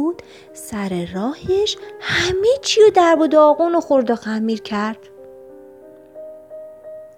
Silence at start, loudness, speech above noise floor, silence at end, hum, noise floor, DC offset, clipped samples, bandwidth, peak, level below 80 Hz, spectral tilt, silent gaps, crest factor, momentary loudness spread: 0 s; -17 LUFS; 25 dB; 0.1 s; none; -42 dBFS; under 0.1%; under 0.1%; 15 kHz; -2 dBFS; -50 dBFS; -4 dB/octave; none; 16 dB; 24 LU